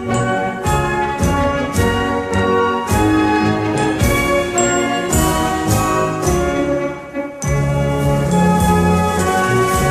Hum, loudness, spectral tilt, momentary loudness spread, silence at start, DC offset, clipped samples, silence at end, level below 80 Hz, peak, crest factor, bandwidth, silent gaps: none; -16 LUFS; -5 dB/octave; 4 LU; 0 s; under 0.1%; under 0.1%; 0 s; -28 dBFS; -2 dBFS; 14 dB; 15.5 kHz; none